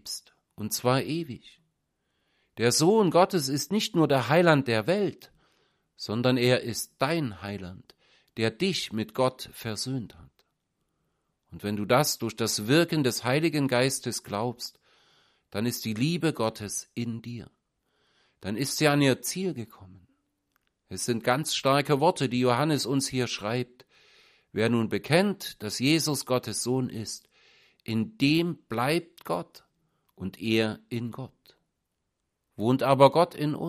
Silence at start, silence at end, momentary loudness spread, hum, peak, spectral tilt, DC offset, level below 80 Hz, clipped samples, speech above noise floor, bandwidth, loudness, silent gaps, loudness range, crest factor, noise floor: 0.05 s; 0 s; 16 LU; none; -4 dBFS; -4.5 dB/octave; under 0.1%; -66 dBFS; under 0.1%; 54 dB; 15.5 kHz; -26 LUFS; none; 7 LU; 24 dB; -81 dBFS